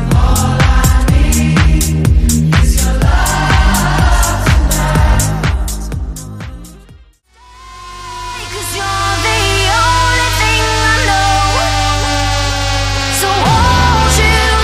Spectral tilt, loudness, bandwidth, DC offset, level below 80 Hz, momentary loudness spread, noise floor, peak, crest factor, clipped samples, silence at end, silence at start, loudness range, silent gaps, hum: -4 dB/octave; -12 LUFS; 15.5 kHz; under 0.1%; -16 dBFS; 12 LU; -43 dBFS; 0 dBFS; 12 dB; under 0.1%; 0 s; 0 s; 9 LU; none; none